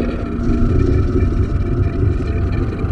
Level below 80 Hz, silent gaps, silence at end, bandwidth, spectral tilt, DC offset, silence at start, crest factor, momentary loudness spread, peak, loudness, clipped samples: -20 dBFS; none; 0 s; 6.6 kHz; -9.5 dB/octave; under 0.1%; 0 s; 12 dB; 4 LU; -2 dBFS; -18 LUFS; under 0.1%